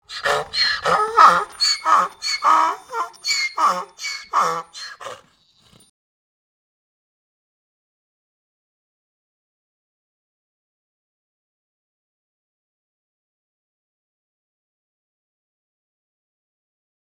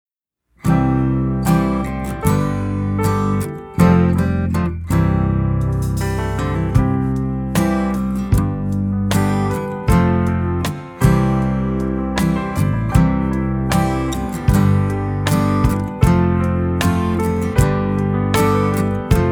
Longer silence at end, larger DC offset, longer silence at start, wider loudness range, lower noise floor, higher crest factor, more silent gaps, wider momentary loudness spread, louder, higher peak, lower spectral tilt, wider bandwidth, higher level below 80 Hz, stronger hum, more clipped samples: first, 12 s vs 0 s; neither; second, 0.1 s vs 0.65 s; first, 12 LU vs 2 LU; second, -57 dBFS vs -68 dBFS; first, 24 dB vs 16 dB; neither; first, 16 LU vs 6 LU; about the same, -18 LUFS vs -18 LUFS; about the same, 0 dBFS vs 0 dBFS; second, -0.5 dB/octave vs -7 dB/octave; second, 17 kHz vs over 20 kHz; second, -64 dBFS vs -28 dBFS; neither; neither